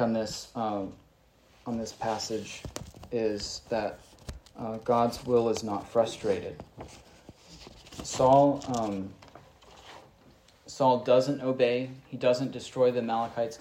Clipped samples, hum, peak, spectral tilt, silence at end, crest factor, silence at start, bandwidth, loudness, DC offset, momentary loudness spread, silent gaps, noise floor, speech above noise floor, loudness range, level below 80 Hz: under 0.1%; none; -10 dBFS; -5.5 dB/octave; 0 s; 20 dB; 0 s; 15.5 kHz; -29 LUFS; under 0.1%; 21 LU; none; -62 dBFS; 33 dB; 7 LU; -58 dBFS